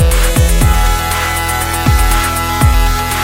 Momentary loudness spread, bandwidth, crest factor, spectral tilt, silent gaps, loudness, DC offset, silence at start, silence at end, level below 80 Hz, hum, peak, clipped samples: 3 LU; 17 kHz; 10 dB; -4 dB/octave; none; -13 LUFS; under 0.1%; 0 s; 0 s; -14 dBFS; none; 0 dBFS; under 0.1%